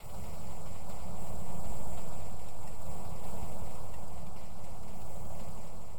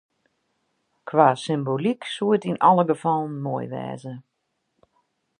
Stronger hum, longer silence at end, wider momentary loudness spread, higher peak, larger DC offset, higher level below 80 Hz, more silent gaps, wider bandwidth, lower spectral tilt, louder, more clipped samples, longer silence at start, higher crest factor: neither; second, 0 s vs 1.2 s; second, 4 LU vs 17 LU; second, -18 dBFS vs -2 dBFS; first, 6% vs under 0.1%; first, -48 dBFS vs -74 dBFS; neither; first, over 20 kHz vs 10 kHz; second, -5.5 dB/octave vs -7 dB/octave; second, -46 LUFS vs -22 LUFS; neither; second, 0 s vs 1.05 s; second, 12 dB vs 22 dB